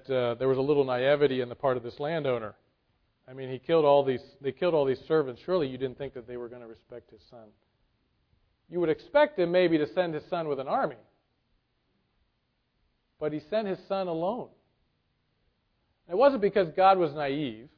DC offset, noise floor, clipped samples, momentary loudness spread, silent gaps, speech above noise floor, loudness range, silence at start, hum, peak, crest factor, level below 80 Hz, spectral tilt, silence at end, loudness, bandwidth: under 0.1%; -75 dBFS; under 0.1%; 16 LU; none; 48 dB; 9 LU; 0.1 s; none; -8 dBFS; 20 dB; -66 dBFS; -9 dB/octave; 0.1 s; -27 LUFS; 5.4 kHz